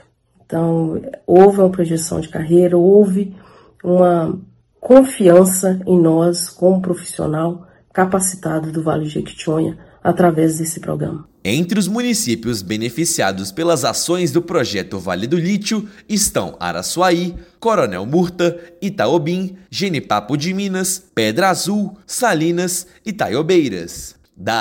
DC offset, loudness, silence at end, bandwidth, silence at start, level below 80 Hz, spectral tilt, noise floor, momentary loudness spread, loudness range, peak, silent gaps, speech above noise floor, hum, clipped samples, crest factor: under 0.1%; -16 LUFS; 0 s; 17 kHz; 0.5 s; -50 dBFS; -5 dB/octave; -53 dBFS; 13 LU; 5 LU; 0 dBFS; none; 37 dB; none; 0.1%; 16 dB